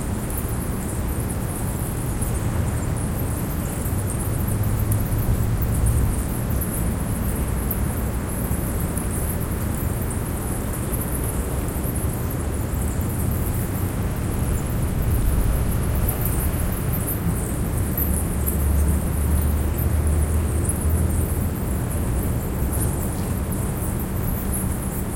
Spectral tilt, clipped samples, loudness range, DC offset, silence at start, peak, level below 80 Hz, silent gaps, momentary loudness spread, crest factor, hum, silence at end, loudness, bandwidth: -6 dB/octave; under 0.1%; 3 LU; under 0.1%; 0 s; -8 dBFS; -26 dBFS; none; 4 LU; 14 dB; none; 0 s; -24 LUFS; 17 kHz